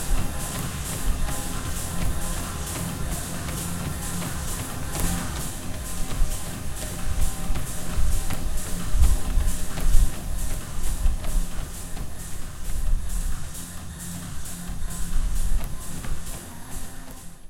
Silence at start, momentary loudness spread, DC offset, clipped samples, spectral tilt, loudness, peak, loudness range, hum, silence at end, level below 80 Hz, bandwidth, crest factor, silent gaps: 0 s; 9 LU; under 0.1%; under 0.1%; -4 dB/octave; -30 LUFS; -4 dBFS; 5 LU; none; 0 s; -26 dBFS; 16.5 kHz; 20 dB; none